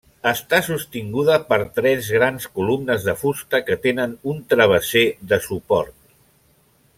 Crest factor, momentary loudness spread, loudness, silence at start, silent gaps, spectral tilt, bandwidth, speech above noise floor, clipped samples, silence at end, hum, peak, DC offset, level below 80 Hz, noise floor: 18 dB; 9 LU; -20 LUFS; 0.25 s; none; -4.5 dB/octave; 16.5 kHz; 39 dB; under 0.1%; 1.1 s; none; -2 dBFS; under 0.1%; -54 dBFS; -58 dBFS